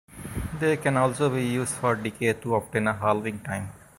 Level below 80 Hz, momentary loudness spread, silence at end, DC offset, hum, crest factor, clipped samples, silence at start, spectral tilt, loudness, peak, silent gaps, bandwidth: -48 dBFS; 10 LU; 0.2 s; under 0.1%; none; 18 dB; under 0.1%; 0.1 s; -5.5 dB/octave; -26 LUFS; -8 dBFS; none; 16.5 kHz